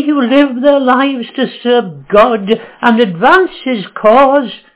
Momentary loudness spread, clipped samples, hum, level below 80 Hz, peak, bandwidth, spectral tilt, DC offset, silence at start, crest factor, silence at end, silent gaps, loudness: 8 LU; 0.9%; none; -48 dBFS; 0 dBFS; 4 kHz; -9 dB/octave; under 0.1%; 0 s; 10 dB; 0.2 s; none; -11 LUFS